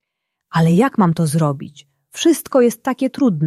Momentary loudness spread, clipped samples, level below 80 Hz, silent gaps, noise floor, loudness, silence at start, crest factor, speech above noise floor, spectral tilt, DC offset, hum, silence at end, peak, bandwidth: 11 LU; under 0.1%; -58 dBFS; none; -78 dBFS; -17 LUFS; 0.55 s; 14 dB; 62 dB; -6.5 dB/octave; under 0.1%; none; 0 s; -2 dBFS; 14.5 kHz